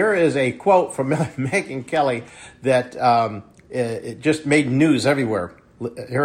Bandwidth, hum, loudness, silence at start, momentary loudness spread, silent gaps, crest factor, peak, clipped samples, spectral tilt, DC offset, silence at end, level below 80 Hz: 13 kHz; none; -20 LUFS; 0 s; 14 LU; none; 16 dB; -4 dBFS; under 0.1%; -6 dB/octave; under 0.1%; 0 s; -58 dBFS